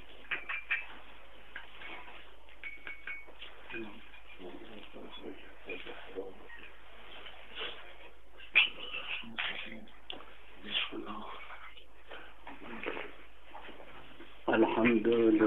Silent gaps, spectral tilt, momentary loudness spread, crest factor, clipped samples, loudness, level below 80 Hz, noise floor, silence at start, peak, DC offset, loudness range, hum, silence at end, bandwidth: none; -6 dB/octave; 25 LU; 26 dB; under 0.1%; -35 LUFS; -64 dBFS; -56 dBFS; 0 s; -12 dBFS; 0.7%; 13 LU; none; 0 s; 4.2 kHz